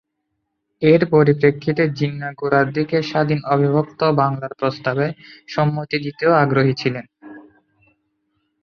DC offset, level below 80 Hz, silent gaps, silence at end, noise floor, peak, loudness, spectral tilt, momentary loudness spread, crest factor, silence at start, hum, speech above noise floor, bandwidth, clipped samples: under 0.1%; -58 dBFS; none; 1.25 s; -75 dBFS; 0 dBFS; -18 LUFS; -8 dB/octave; 9 LU; 18 dB; 0.8 s; none; 57 dB; 6.6 kHz; under 0.1%